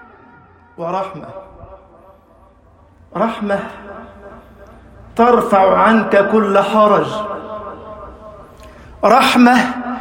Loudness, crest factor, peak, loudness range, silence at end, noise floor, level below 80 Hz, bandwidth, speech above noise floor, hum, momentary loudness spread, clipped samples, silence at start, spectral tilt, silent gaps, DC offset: -13 LUFS; 16 dB; 0 dBFS; 12 LU; 0 s; -47 dBFS; -48 dBFS; 16 kHz; 34 dB; none; 23 LU; under 0.1%; 0.8 s; -5.5 dB/octave; none; under 0.1%